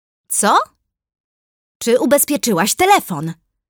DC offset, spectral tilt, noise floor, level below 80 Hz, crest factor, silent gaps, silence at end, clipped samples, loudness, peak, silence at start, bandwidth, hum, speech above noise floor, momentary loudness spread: under 0.1%; -3 dB/octave; under -90 dBFS; -58 dBFS; 16 dB; 1.20-1.80 s; 0.35 s; under 0.1%; -15 LUFS; -2 dBFS; 0.3 s; over 20 kHz; none; over 75 dB; 12 LU